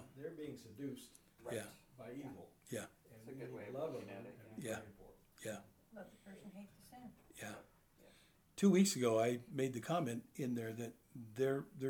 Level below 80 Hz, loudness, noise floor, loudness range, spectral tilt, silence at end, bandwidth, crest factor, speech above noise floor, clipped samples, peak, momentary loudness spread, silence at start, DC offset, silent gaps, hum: -78 dBFS; -41 LUFS; -69 dBFS; 15 LU; -5.5 dB/octave; 0 s; 18 kHz; 22 dB; 28 dB; under 0.1%; -20 dBFS; 22 LU; 0 s; under 0.1%; none; none